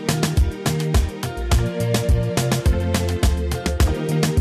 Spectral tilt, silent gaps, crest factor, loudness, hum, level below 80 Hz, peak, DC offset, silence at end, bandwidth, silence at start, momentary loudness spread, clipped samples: -5.5 dB/octave; none; 10 dB; -21 LUFS; none; -24 dBFS; -8 dBFS; under 0.1%; 0 s; 14.5 kHz; 0 s; 3 LU; under 0.1%